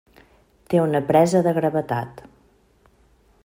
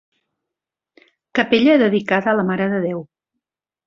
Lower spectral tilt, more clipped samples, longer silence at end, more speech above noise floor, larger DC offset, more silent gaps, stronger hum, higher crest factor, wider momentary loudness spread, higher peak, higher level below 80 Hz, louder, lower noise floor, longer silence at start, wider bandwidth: about the same, -7 dB/octave vs -7 dB/octave; neither; first, 1.25 s vs 0.85 s; second, 39 dB vs 68 dB; neither; neither; neither; about the same, 20 dB vs 18 dB; about the same, 11 LU vs 10 LU; about the same, -4 dBFS vs -2 dBFS; about the same, -58 dBFS vs -62 dBFS; second, -20 LUFS vs -17 LUFS; second, -58 dBFS vs -85 dBFS; second, 0.7 s vs 1.35 s; first, 16 kHz vs 7.2 kHz